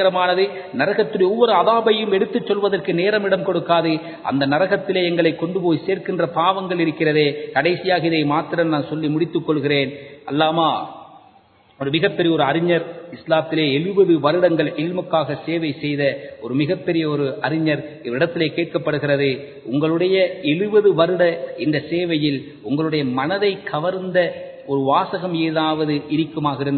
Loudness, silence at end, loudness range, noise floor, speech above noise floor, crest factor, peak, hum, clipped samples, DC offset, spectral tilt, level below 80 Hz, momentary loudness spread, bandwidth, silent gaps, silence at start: -19 LUFS; 0 s; 3 LU; -53 dBFS; 34 dB; 18 dB; -2 dBFS; none; under 0.1%; under 0.1%; -11 dB/octave; -62 dBFS; 7 LU; 4.5 kHz; none; 0 s